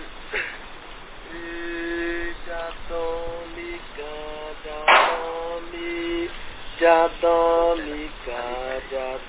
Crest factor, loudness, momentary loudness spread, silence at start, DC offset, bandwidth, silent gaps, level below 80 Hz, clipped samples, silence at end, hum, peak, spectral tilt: 22 dB; -24 LUFS; 18 LU; 0 s; under 0.1%; 4 kHz; none; -44 dBFS; under 0.1%; 0 s; none; -2 dBFS; -7.5 dB/octave